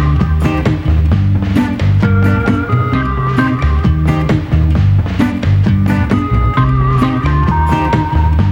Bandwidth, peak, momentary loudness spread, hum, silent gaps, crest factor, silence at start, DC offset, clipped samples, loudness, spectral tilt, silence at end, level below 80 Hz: 7.6 kHz; 0 dBFS; 2 LU; none; none; 10 dB; 0 s; under 0.1%; under 0.1%; -13 LUFS; -8.5 dB/octave; 0 s; -18 dBFS